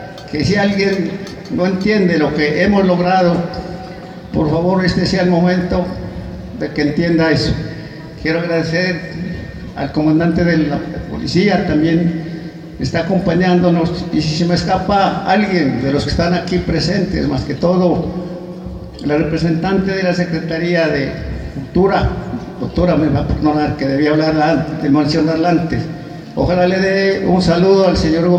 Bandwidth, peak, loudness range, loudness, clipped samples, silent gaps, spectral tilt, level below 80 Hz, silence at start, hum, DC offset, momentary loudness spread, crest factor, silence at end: 9 kHz; 0 dBFS; 3 LU; -15 LUFS; under 0.1%; none; -7 dB/octave; -34 dBFS; 0 s; none; under 0.1%; 12 LU; 14 dB; 0 s